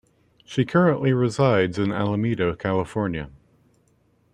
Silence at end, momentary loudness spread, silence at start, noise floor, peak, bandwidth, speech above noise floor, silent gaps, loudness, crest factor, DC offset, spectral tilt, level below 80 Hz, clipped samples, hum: 1.05 s; 9 LU; 0.5 s; -63 dBFS; -6 dBFS; 10 kHz; 41 dB; none; -22 LUFS; 18 dB; under 0.1%; -7.5 dB/octave; -52 dBFS; under 0.1%; none